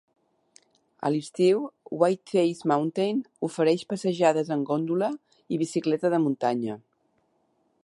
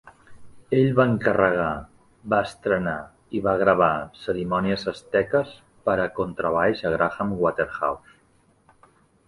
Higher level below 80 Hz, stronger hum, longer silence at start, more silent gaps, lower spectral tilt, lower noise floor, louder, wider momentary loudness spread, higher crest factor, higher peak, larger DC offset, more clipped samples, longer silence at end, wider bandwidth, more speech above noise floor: second, -78 dBFS vs -52 dBFS; neither; first, 1 s vs 0.05 s; neither; about the same, -6.5 dB/octave vs -7.5 dB/octave; first, -70 dBFS vs -61 dBFS; second, -26 LUFS vs -23 LUFS; about the same, 9 LU vs 10 LU; about the same, 20 dB vs 20 dB; about the same, -6 dBFS vs -4 dBFS; neither; neither; second, 1.05 s vs 1.3 s; about the same, 11.5 kHz vs 11.5 kHz; first, 45 dB vs 38 dB